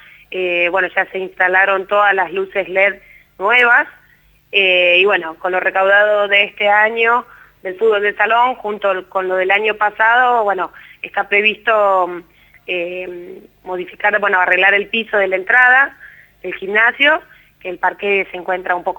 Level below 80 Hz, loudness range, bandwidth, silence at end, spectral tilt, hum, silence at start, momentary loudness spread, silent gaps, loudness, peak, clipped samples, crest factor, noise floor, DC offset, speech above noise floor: -58 dBFS; 4 LU; 19 kHz; 0.05 s; -4.5 dB/octave; 50 Hz at -65 dBFS; 0.3 s; 15 LU; none; -14 LUFS; 0 dBFS; under 0.1%; 16 dB; -52 dBFS; under 0.1%; 37 dB